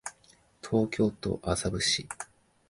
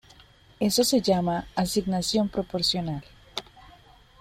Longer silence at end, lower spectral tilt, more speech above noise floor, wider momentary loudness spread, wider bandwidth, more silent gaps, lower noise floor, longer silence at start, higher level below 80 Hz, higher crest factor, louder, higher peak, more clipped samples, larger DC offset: about the same, 0.45 s vs 0.55 s; about the same, -4 dB/octave vs -4.5 dB/octave; first, 33 dB vs 29 dB; about the same, 16 LU vs 16 LU; second, 11.5 kHz vs 16.5 kHz; neither; first, -62 dBFS vs -54 dBFS; second, 0.05 s vs 0.6 s; about the same, -50 dBFS vs -52 dBFS; about the same, 18 dB vs 18 dB; second, -29 LUFS vs -25 LUFS; about the same, -12 dBFS vs -10 dBFS; neither; neither